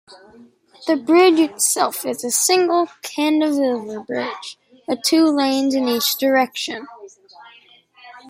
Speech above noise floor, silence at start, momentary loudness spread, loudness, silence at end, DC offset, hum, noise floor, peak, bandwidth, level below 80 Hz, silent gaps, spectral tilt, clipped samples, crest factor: 32 dB; 0.1 s; 13 LU; -18 LUFS; 0.1 s; under 0.1%; none; -50 dBFS; -4 dBFS; 16 kHz; -72 dBFS; none; -1.5 dB/octave; under 0.1%; 16 dB